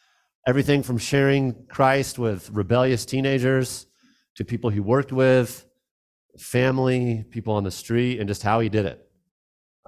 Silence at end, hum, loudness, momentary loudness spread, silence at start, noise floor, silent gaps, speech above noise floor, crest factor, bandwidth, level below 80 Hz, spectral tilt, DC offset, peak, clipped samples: 0.9 s; none; -23 LUFS; 10 LU; 0.45 s; under -90 dBFS; 4.30-4.36 s, 5.91-6.29 s; over 68 dB; 18 dB; 15.5 kHz; -50 dBFS; -6 dB/octave; under 0.1%; -4 dBFS; under 0.1%